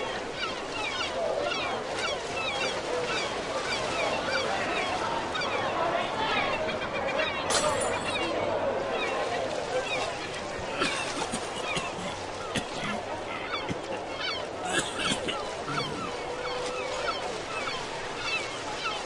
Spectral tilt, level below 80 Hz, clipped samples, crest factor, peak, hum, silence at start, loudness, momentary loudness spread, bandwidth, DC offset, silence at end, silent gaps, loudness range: -2.5 dB/octave; -54 dBFS; under 0.1%; 18 dB; -12 dBFS; none; 0 s; -30 LUFS; 6 LU; 11.5 kHz; under 0.1%; 0 s; none; 4 LU